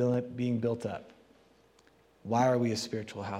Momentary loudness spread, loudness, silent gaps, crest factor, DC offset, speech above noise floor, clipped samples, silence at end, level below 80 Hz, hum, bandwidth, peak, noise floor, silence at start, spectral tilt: 12 LU; -31 LUFS; none; 18 dB; under 0.1%; 33 dB; under 0.1%; 0 s; -74 dBFS; none; 13.5 kHz; -14 dBFS; -64 dBFS; 0 s; -6.5 dB/octave